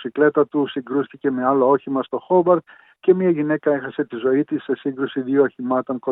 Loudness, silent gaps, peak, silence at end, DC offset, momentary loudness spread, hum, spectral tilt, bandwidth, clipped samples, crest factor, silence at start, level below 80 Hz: -20 LUFS; none; -4 dBFS; 0 s; under 0.1%; 7 LU; none; -11 dB/octave; 4 kHz; under 0.1%; 16 dB; 0 s; -82 dBFS